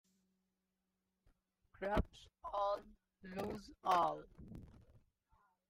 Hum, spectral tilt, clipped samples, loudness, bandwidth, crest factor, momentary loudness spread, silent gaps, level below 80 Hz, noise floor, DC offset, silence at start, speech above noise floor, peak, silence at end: none; -6 dB/octave; under 0.1%; -41 LUFS; 15.5 kHz; 24 dB; 21 LU; none; -56 dBFS; -88 dBFS; under 0.1%; 1.8 s; 48 dB; -20 dBFS; 0.7 s